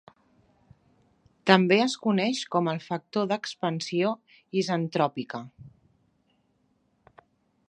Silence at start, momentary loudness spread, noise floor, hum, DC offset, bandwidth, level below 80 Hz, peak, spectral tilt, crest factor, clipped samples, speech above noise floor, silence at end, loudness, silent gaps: 1.45 s; 14 LU; -70 dBFS; none; under 0.1%; 10 kHz; -74 dBFS; -2 dBFS; -5.5 dB/octave; 28 dB; under 0.1%; 44 dB; 2 s; -26 LUFS; none